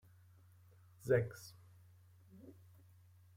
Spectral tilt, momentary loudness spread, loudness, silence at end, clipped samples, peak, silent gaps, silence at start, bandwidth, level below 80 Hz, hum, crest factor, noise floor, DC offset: -7 dB/octave; 28 LU; -38 LUFS; 0.85 s; under 0.1%; -20 dBFS; none; 1.05 s; 16.5 kHz; -74 dBFS; none; 24 dB; -64 dBFS; under 0.1%